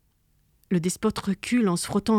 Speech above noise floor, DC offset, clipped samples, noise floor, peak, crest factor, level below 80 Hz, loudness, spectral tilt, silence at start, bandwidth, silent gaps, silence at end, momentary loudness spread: 42 dB; under 0.1%; under 0.1%; -66 dBFS; -10 dBFS; 14 dB; -54 dBFS; -26 LUFS; -5.5 dB/octave; 0.7 s; 15.5 kHz; none; 0 s; 5 LU